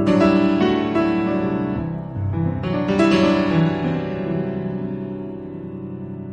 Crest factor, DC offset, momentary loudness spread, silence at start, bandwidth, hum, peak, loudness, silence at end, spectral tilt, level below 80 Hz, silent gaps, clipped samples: 16 dB; under 0.1%; 16 LU; 0 s; 8.8 kHz; none; -4 dBFS; -20 LUFS; 0 s; -8 dB/octave; -44 dBFS; none; under 0.1%